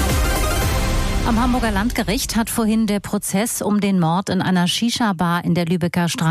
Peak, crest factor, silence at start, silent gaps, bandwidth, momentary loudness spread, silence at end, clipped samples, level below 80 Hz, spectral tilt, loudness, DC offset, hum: -8 dBFS; 10 dB; 0 s; none; 15.5 kHz; 3 LU; 0 s; under 0.1%; -26 dBFS; -5 dB/octave; -19 LUFS; under 0.1%; none